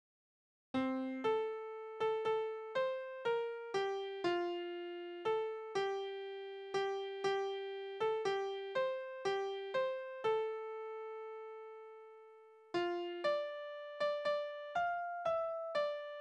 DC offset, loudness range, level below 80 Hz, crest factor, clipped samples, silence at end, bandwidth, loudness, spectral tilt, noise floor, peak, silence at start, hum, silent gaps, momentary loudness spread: under 0.1%; 4 LU; -82 dBFS; 16 dB; under 0.1%; 0 s; 9.8 kHz; -39 LUFS; -4.5 dB/octave; -60 dBFS; -24 dBFS; 0.75 s; none; none; 9 LU